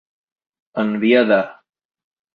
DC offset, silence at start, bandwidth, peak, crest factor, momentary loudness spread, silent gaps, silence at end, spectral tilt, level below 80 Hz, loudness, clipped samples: under 0.1%; 0.75 s; 5 kHz; -2 dBFS; 18 dB; 16 LU; none; 0.85 s; -8 dB/octave; -66 dBFS; -17 LUFS; under 0.1%